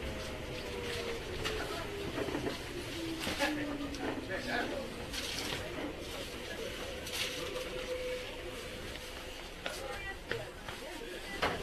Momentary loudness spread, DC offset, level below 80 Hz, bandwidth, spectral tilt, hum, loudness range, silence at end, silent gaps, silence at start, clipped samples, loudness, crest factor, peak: 7 LU; under 0.1%; -50 dBFS; 14 kHz; -3.5 dB/octave; none; 4 LU; 0 s; none; 0 s; under 0.1%; -39 LUFS; 22 dB; -18 dBFS